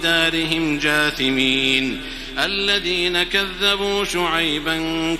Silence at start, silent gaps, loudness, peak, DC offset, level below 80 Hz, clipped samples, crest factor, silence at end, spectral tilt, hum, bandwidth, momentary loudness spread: 0 s; none; -18 LUFS; -2 dBFS; under 0.1%; -40 dBFS; under 0.1%; 18 dB; 0 s; -3 dB/octave; none; 16 kHz; 5 LU